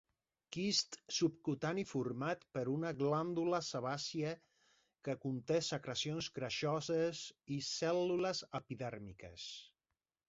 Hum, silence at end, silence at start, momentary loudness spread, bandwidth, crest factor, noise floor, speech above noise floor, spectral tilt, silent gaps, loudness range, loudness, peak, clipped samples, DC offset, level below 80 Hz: none; 0.6 s; 0.5 s; 12 LU; 7.6 kHz; 18 dB; under -90 dBFS; over 51 dB; -4.5 dB/octave; none; 2 LU; -39 LUFS; -22 dBFS; under 0.1%; under 0.1%; -74 dBFS